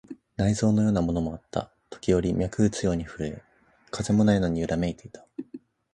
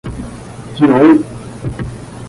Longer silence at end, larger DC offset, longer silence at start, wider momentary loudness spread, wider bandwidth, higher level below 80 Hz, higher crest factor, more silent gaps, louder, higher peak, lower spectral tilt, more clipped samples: first, 0.35 s vs 0 s; neither; about the same, 0.1 s vs 0.05 s; about the same, 19 LU vs 20 LU; about the same, 11.5 kHz vs 11.5 kHz; second, -44 dBFS vs -36 dBFS; about the same, 18 dB vs 14 dB; neither; second, -26 LUFS vs -11 LUFS; second, -8 dBFS vs 0 dBFS; about the same, -6.5 dB/octave vs -7.5 dB/octave; neither